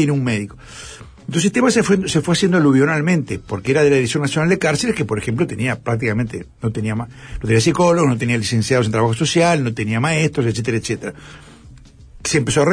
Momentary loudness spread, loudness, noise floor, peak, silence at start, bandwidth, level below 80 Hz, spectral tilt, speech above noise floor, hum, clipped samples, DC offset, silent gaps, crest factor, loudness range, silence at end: 12 LU; -17 LUFS; -42 dBFS; -4 dBFS; 0 s; 11 kHz; -44 dBFS; -5.5 dB/octave; 25 dB; none; under 0.1%; under 0.1%; none; 14 dB; 4 LU; 0 s